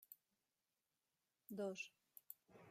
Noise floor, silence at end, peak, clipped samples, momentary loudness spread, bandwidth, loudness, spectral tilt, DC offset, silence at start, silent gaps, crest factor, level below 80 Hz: under -90 dBFS; 0 s; -34 dBFS; under 0.1%; 18 LU; 16 kHz; -52 LUFS; -4.5 dB/octave; under 0.1%; 0 s; none; 22 dB; under -90 dBFS